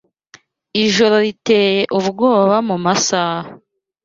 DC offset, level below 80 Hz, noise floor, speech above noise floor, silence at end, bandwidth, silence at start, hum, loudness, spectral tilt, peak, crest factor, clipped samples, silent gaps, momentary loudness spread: under 0.1%; -58 dBFS; -48 dBFS; 34 dB; 0.5 s; 7.8 kHz; 0.75 s; none; -15 LUFS; -4 dB/octave; -2 dBFS; 14 dB; under 0.1%; none; 9 LU